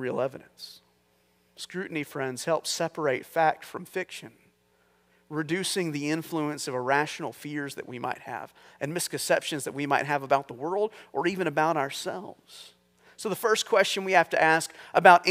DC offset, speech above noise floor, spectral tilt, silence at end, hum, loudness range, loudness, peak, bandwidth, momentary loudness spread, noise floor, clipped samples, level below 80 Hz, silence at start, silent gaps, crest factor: under 0.1%; 40 dB; -3.5 dB/octave; 0 s; 60 Hz at -70 dBFS; 5 LU; -27 LUFS; 0 dBFS; 16 kHz; 16 LU; -67 dBFS; under 0.1%; -78 dBFS; 0 s; none; 28 dB